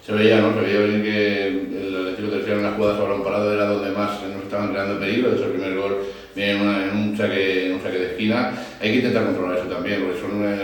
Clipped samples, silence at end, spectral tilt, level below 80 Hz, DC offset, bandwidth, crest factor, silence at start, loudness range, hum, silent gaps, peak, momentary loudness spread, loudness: under 0.1%; 0 s; -6.5 dB/octave; -54 dBFS; under 0.1%; 18 kHz; 18 dB; 0.05 s; 2 LU; none; none; -4 dBFS; 7 LU; -21 LUFS